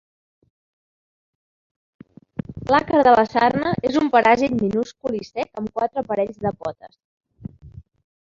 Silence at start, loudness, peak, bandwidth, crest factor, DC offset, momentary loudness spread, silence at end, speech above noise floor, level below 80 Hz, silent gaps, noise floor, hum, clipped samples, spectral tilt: 2.5 s; -20 LUFS; -2 dBFS; 7.6 kHz; 20 dB; under 0.1%; 19 LU; 0.5 s; over 71 dB; -52 dBFS; 7.04-7.18 s; under -90 dBFS; none; under 0.1%; -6.5 dB/octave